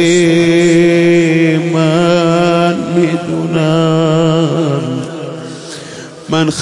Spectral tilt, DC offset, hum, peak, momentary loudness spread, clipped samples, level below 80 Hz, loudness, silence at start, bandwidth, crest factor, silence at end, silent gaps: -6 dB/octave; under 0.1%; none; 0 dBFS; 17 LU; under 0.1%; -50 dBFS; -11 LUFS; 0 s; 11.5 kHz; 10 dB; 0 s; none